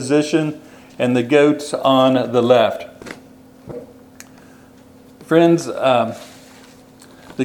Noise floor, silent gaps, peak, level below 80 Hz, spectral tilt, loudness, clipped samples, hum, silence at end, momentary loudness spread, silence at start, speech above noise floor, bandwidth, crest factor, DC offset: -45 dBFS; none; 0 dBFS; -60 dBFS; -5.5 dB/octave; -16 LUFS; under 0.1%; none; 0 s; 22 LU; 0 s; 30 dB; 18.5 kHz; 18 dB; under 0.1%